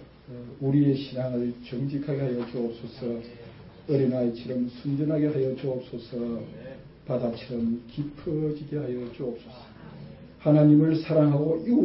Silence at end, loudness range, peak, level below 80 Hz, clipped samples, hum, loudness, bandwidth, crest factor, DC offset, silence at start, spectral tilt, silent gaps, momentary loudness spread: 0 s; 7 LU; -8 dBFS; -58 dBFS; under 0.1%; none; -27 LUFS; 5.8 kHz; 18 dB; under 0.1%; 0 s; -12.5 dB/octave; none; 22 LU